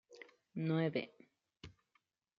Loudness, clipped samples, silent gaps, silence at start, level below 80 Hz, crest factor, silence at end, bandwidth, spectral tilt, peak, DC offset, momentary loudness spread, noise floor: -39 LUFS; under 0.1%; none; 0.1 s; -76 dBFS; 20 dB; 0.65 s; 7 kHz; -6.5 dB/octave; -24 dBFS; under 0.1%; 23 LU; -81 dBFS